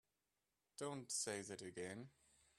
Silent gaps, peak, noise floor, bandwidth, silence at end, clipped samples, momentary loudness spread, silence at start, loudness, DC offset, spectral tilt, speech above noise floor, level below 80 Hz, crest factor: none; -30 dBFS; under -90 dBFS; 13 kHz; 0.5 s; under 0.1%; 15 LU; 0.8 s; -48 LUFS; under 0.1%; -2.5 dB/octave; over 41 dB; -86 dBFS; 22 dB